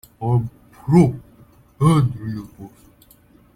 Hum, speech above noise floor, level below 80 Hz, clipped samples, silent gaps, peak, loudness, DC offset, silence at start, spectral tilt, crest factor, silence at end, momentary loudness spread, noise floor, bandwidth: none; 34 dB; -48 dBFS; under 0.1%; none; -2 dBFS; -19 LUFS; under 0.1%; 0.2 s; -8.5 dB/octave; 18 dB; 0.9 s; 18 LU; -52 dBFS; 15 kHz